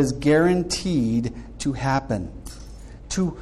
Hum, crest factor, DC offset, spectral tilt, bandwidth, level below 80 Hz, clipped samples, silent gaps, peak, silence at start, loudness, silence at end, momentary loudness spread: none; 14 dB; under 0.1%; -5.5 dB/octave; 13 kHz; -40 dBFS; under 0.1%; none; -10 dBFS; 0 s; -23 LUFS; 0 s; 22 LU